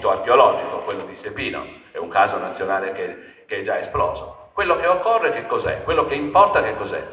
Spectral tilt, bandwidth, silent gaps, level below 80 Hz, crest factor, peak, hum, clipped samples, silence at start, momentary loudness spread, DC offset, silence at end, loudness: -8.5 dB/octave; 4 kHz; none; -46 dBFS; 20 dB; 0 dBFS; none; under 0.1%; 0 s; 16 LU; under 0.1%; 0 s; -20 LUFS